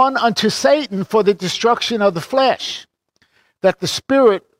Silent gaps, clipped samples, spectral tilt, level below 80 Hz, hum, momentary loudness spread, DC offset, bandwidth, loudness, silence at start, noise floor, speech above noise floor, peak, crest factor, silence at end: none; under 0.1%; -4 dB/octave; -60 dBFS; none; 7 LU; under 0.1%; 16 kHz; -16 LUFS; 0 s; -61 dBFS; 45 dB; -2 dBFS; 14 dB; 0.2 s